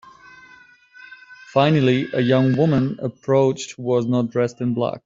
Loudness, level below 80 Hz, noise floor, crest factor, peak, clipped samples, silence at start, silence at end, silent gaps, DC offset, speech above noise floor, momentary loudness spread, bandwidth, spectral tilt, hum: -20 LUFS; -56 dBFS; -49 dBFS; 16 dB; -4 dBFS; under 0.1%; 1.1 s; 0.05 s; none; under 0.1%; 31 dB; 7 LU; 7.8 kHz; -7 dB/octave; none